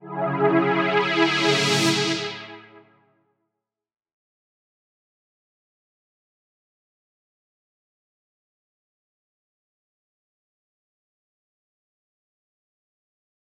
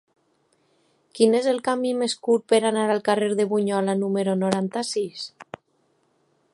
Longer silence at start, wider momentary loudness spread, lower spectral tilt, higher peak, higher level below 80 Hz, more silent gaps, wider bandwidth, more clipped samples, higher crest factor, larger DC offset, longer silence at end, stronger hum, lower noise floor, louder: second, 0.05 s vs 1.15 s; about the same, 11 LU vs 13 LU; about the same, -4 dB/octave vs -5 dB/octave; about the same, -2 dBFS vs -4 dBFS; second, under -90 dBFS vs -74 dBFS; neither; first, 15.5 kHz vs 11.5 kHz; neither; first, 26 dB vs 20 dB; neither; first, 10.75 s vs 1.1 s; neither; first, -82 dBFS vs -67 dBFS; about the same, -21 LUFS vs -23 LUFS